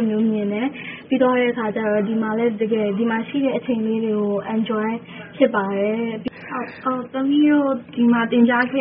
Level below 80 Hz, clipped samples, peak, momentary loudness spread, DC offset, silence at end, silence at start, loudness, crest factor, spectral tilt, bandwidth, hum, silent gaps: -62 dBFS; under 0.1%; -2 dBFS; 10 LU; under 0.1%; 0 s; 0 s; -20 LUFS; 18 dB; -3 dB/octave; 3.9 kHz; none; none